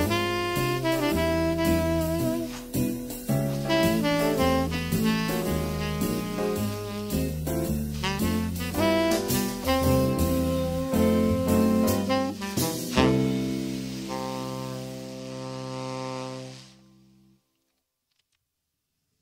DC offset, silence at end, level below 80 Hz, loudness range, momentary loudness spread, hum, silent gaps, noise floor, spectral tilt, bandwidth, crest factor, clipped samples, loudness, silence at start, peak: under 0.1%; 2.55 s; -42 dBFS; 13 LU; 11 LU; none; none; -80 dBFS; -5.5 dB/octave; 16.5 kHz; 20 dB; under 0.1%; -26 LUFS; 0 s; -6 dBFS